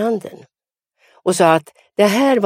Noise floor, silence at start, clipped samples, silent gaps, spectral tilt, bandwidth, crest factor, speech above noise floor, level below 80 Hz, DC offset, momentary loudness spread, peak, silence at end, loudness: -71 dBFS; 0 s; under 0.1%; none; -4.5 dB/octave; 16 kHz; 18 dB; 56 dB; -68 dBFS; under 0.1%; 14 LU; 0 dBFS; 0 s; -16 LUFS